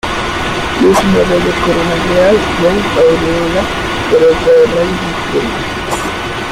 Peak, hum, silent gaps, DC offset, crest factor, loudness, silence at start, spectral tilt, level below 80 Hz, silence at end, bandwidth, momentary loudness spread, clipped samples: 0 dBFS; none; none; under 0.1%; 10 dB; -12 LUFS; 0.05 s; -5 dB/octave; -30 dBFS; 0 s; 16 kHz; 8 LU; under 0.1%